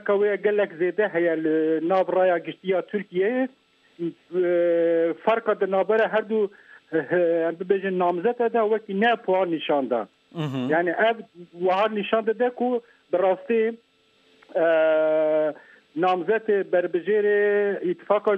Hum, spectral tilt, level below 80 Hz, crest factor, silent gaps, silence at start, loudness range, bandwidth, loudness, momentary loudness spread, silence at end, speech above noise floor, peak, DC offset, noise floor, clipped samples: none; -8 dB/octave; -80 dBFS; 16 dB; none; 0.05 s; 2 LU; 5.4 kHz; -23 LUFS; 8 LU; 0 s; 38 dB; -8 dBFS; under 0.1%; -61 dBFS; under 0.1%